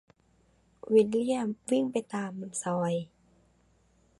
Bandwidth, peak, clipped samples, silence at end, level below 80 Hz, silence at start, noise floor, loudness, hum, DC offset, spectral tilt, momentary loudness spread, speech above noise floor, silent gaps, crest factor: 11.5 kHz; -12 dBFS; under 0.1%; 1.15 s; -70 dBFS; 0.85 s; -67 dBFS; -29 LUFS; none; under 0.1%; -5.5 dB/octave; 11 LU; 38 dB; none; 20 dB